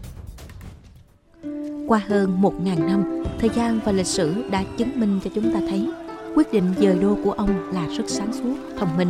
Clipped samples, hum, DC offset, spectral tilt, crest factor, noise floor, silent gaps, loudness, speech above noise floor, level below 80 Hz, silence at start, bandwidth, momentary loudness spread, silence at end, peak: under 0.1%; none; under 0.1%; -6 dB/octave; 18 dB; -50 dBFS; none; -22 LUFS; 29 dB; -44 dBFS; 0 s; 13.5 kHz; 15 LU; 0 s; -6 dBFS